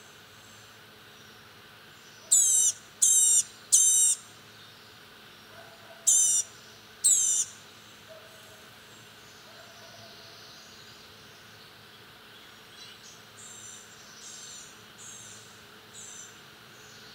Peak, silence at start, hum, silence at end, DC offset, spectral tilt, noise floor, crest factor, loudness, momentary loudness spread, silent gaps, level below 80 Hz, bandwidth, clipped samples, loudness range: -8 dBFS; 2.3 s; none; 0.9 s; under 0.1%; 1.5 dB/octave; -52 dBFS; 24 dB; -21 LUFS; 28 LU; none; -76 dBFS; 16 kHz; under 0.1%; 23 LU